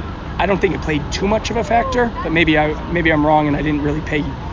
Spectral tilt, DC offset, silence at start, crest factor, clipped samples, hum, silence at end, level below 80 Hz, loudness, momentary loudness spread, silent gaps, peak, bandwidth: -6 dB/octave; under 0.1%; 0 s; 16 dB; under 0.1%; none; 0 s; -30 dBFS; -17 LUFS; 6 LU; none; -2 dBFS; 7.6 kHz